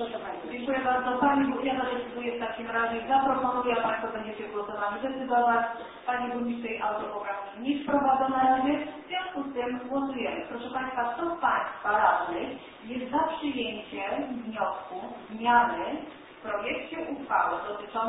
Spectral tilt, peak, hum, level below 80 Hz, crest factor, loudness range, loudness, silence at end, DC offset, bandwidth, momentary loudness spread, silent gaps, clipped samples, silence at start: -8.5 dB/octave; -10 dBFS; none; -62 dBFS; 20 dB; 2 LU; -29 LUFS; 0 s; under 0.1%; 4 kHz; 11 LU; none; under 0.1%; 0 s